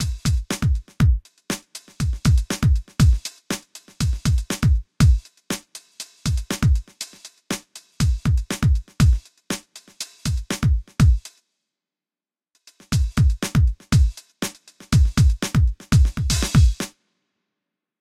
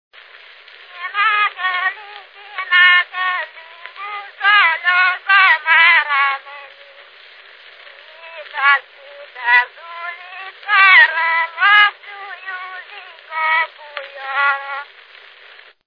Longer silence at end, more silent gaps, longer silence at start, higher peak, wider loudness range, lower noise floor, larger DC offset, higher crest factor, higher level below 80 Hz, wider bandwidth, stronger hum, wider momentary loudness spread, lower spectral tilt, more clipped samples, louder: about the same, 1.1 s vs 1.05 s; neither; second, 0 s vs 0.95 s; second, -4 dBFS vs 0 dBFS; second, 4 LU vs 8 LU; first, under -90 dBFS vs -44 dBFS; neither; about the same, 16 dB vs 18 dB; first, -24 dBFS vs under -90 dBFS; first, 15.5 kHz vs 5.4 kHz; neither; second, 12 LU vs 22 LU; first, -5.5 dB/octave vs 1.5 dB/octave; neither; second, -22 LUFS vs -13 LUFS